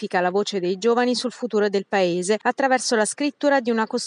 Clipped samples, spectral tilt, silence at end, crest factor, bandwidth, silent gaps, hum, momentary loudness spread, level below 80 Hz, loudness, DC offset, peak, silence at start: under 0.1%; -3.5 dB/octave; 0 s; 16 dB; 11.5 kHz; none; none; 4 LU; -80 dBFS; -21 LUFS; under 0.1%; -6 dBFS; 0 s